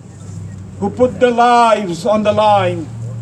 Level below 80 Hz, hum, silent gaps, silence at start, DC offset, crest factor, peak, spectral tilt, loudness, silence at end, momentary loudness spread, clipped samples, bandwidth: -46 dBFS; none; none; 0.05 s; under 0.1%; 14 dB; 0 dBFS; -6 dB/octave; -13 LUFS; 0 s; 20 LU; under 0.1%; 11.5 kHz